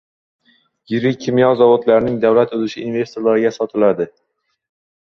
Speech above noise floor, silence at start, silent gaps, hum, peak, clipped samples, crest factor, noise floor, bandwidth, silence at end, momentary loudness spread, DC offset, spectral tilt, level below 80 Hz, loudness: 40 dB; 0.9 s; none; none; -2 dBFS; under 0.1%; 16 dB; -55 dBFS; 6.8 kHz; 0.95 s; 10 LU; under 0.1%; -7 dB/octave; -54 dBFS; -16 LUFS